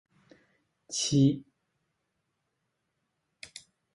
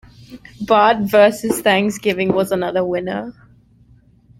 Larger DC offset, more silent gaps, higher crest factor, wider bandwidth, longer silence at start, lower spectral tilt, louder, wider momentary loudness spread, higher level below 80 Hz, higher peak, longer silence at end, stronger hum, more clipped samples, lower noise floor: neither; neither; first, 22 dB vs 16 dB; second, 11.5 kHz vs 16.5 kHz; first, 0.9 s vs 0.3 s; about the same, -5 dB/octave vs -5 dB/octave; second, -28 LUFS vs -16 LUFS; first, 25 LU vs 13 LU; second, -68 dBFS vs -52 dBFS; second, -12 dBFS vs -2 dBFS; first, 2.5 s vs 1.1 s; neither; neither; first, -81 dBFS vs -50 dBFS